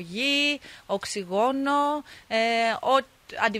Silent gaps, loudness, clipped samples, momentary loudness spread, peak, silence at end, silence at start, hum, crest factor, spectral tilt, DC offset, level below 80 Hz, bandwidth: none; -25 LUFS; under 0.1%; 10 LU; -8 dBFS; 0 s; 0 s; none; 18 dB; -3 dB/octave; under 0.1%; -64 dBFS; 15.5 kHz